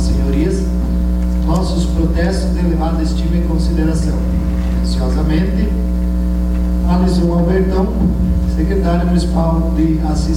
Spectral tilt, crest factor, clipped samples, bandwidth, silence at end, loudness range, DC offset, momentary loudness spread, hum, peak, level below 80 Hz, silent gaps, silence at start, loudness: -7.5 dB/octave; 10 dB; under 0.1%; 11 kHz; 0 s; 2 LU; under 0.1%; 3 LU; none; -4 dBFS; -16 dBFS; none; 0 s; -16 LUFS